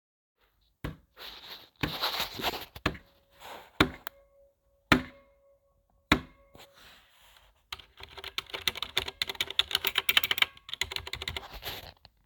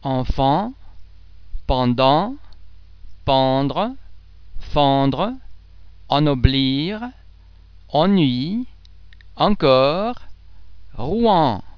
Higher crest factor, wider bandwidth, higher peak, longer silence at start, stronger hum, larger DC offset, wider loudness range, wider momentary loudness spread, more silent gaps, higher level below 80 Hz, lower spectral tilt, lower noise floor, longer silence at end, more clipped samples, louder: first, 32 dB vs 20 dB; first, 19 kHz vs 5.4 kHz; second, -4 dBFS vs 0 dBFS; first, 0.85 s vs 0 s; neither; second, under 0.1% vs 1%; first, 7 LU vs 2 LU; first, 20 LU vs 14 LU; neither; second, -52 dBFS vs -34 dBFS; second, -3 dB/octave vs -8.5 dB/octave; first, -70 dBFS vs -45 dBFS; first, 0.35 s vs 0 s; neither; second, -30 LUFS vs -19 LUFS